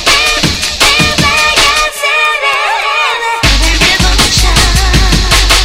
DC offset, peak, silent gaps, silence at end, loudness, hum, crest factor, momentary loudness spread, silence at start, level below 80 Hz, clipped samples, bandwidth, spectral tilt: under 0.1%; 0 dBFS; none; 0 s; -8 LUFS; none; 8 dB; 4 LU; 0 s; -14 dBFS; 0.9%; 16.5 kHz; -2.5 dB/octave